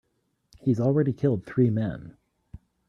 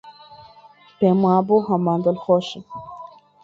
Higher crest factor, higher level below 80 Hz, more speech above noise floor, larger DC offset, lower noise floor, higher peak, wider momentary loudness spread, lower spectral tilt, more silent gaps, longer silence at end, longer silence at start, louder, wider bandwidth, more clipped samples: about the same, 16 dB vs 16 dB; first, -56 dBFS vs -62 dBFS; first, 43 dB vs 31 dB; neither; first, -67 dBFS vs -49 dBFS; second, -10 dBFS vs -4 dBFS; second, 9 LU vs 20 LU; first, -10.5 dB/octave vs -8.5 dB/octave; neither; first, 0.8 s vs 0.4 s; first, 0.65 s vs 0.05 s; second, -25 LUFS vs -19 LUFS; about the same, 7 kHz vs 7.4 kHz; neither